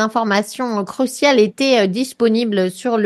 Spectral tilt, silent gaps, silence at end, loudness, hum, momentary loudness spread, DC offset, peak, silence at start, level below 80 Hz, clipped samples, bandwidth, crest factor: -4.5 dB/octave; none; 0 s; -17 LUFS; none; 8 LU; under 0.1%; -2 dBFS; 0 s; -66 dBFS; under 0.1%; 12.5 kHz; 14 dB